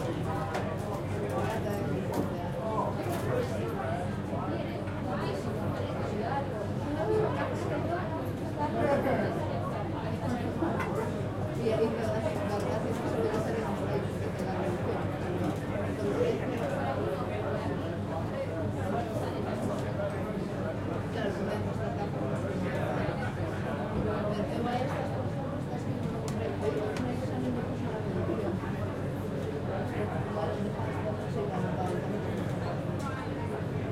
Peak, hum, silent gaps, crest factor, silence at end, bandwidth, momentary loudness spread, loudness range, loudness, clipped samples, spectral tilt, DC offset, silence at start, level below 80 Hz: -14 dBFS; none; none; 18 dB; 0 s; 16 kHz; 4 LU; 2 LU; -32 LUFS; under 0.1%; -7.5 dB/octave; under 0.1%; 0 s; -50 dBFS